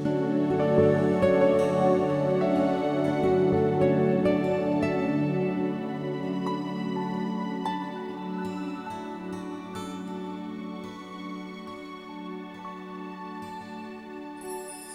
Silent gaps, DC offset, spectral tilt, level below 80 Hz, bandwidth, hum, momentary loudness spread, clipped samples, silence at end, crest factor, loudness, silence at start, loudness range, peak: none; under 0.1%; -7.5 dB/octave; -60 dBFS; 13 kHz; none; 17 LU; under 0.1%; 0 s; 18 dB; -27 LUFS; 0 s; 15 LU; -10 dBFS